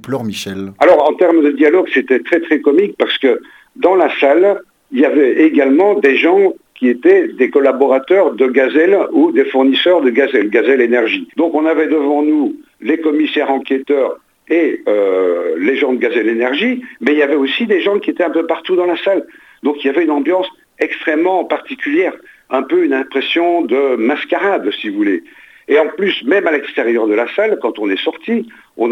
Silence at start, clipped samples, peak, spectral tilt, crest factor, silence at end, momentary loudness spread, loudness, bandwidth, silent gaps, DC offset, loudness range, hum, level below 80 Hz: 0.05 s; under 0.1%; 0 dBFS; -5.5 dB/octave; 14 dB; 0 s; 8 LU; -13 LUFS; 11.5 kHz; none; under 0.1%; 4 LU; none; -66 dBFS